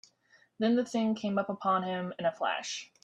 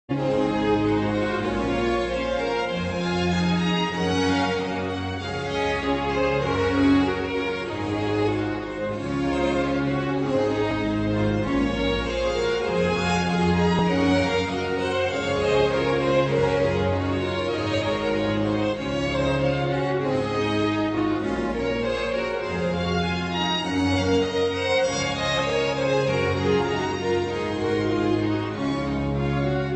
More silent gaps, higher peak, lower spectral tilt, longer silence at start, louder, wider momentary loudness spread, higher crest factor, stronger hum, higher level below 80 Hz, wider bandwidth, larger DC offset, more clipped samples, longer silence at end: neither; second, -16 dBFS vs -8 dBFS; about the same, -5 dB/octave vs -6 dB/octave; first, 0.6 s vs 0.1 s; second, -31 LUFS vs -24 LUFS; about the same, 6 LU vs 5 LU; about the same, 16 dB vs 14 dB; neither; second, -76 dBFS vs -42 dBFS; first, 9.8 kHz vs 8.8 kHz; neither; neither; first, 0.2 s vs 0 s